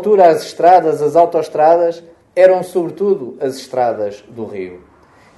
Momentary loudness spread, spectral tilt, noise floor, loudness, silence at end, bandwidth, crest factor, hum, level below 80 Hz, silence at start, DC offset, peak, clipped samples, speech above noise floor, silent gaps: 17 LU; -6 dB/octave; -47 dBFS; -14 LUFS; 0.6 s; 12.5 kHz; 14 dB; none; -60 dBFS; 0 s; under 0.1%; 0 dBFS; under 0.1%; 34 dB; none